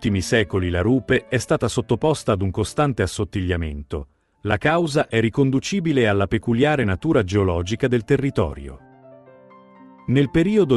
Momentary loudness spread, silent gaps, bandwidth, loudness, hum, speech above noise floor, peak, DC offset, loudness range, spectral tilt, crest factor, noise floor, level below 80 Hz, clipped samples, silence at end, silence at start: 7 LU; none; 12 kHz; -21 LUFS; none; 28 dB; -4 dBFS; under 0.1%; 3 LU; -6 dB/octave; 18 dB; -47 dBFS; -42 dBFS; under 0.1%; 0 s; 0 s